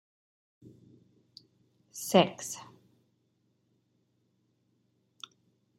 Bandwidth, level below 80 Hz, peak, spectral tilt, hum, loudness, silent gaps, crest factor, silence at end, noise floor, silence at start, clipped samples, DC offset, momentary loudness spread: 16 kHz; -82 dBFS; -8 dBFS; -4.5 dB/octave; 60 Hz at -65 dBFS; -29 LUFS; none; 30 dB; 3.15 s; -74 dBFS; 1.95 s; under 0.1%; under 0.1%; 24 LU